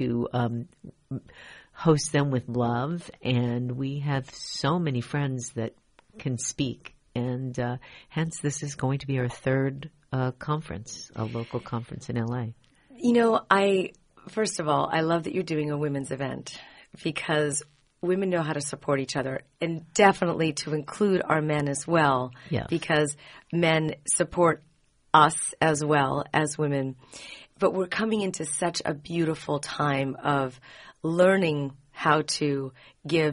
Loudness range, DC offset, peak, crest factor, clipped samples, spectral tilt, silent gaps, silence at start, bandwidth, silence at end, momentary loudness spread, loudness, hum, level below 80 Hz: 6 LU; under 0.1%; -4 dBFS; 22 dB; under 0.1%; -5 dB/octave; none; 0 s; 10.5 kHz; 0 s; 14 LU; -27 LUFS; none; -58 dBFS